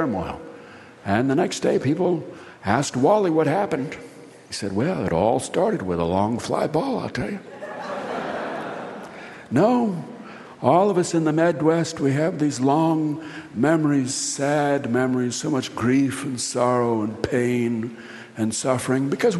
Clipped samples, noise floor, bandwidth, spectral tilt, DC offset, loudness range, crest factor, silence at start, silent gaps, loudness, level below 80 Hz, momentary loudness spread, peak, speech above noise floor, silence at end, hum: under 0.1%; -43 dBFS; 12 kHz; -5.5 dB/octave; under 0.1%; 5 LU; 18 dB; 0 s; none; -22 LUFS; -56 dBFS; 14 LU; -4 dBFS; 22 dB; 0 s; none